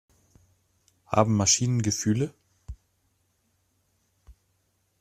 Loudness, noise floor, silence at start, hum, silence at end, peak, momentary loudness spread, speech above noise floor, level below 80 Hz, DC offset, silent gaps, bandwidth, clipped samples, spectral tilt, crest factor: -24 LUFS; -72 dBFS; 1.1 s; none; 0.7 s; -4 dBFS; 26 LU; 48 dB; -54 dBFS; under 0.1%; none; 14 kHz; under 0.1%; -4 dB/octave; 26 dB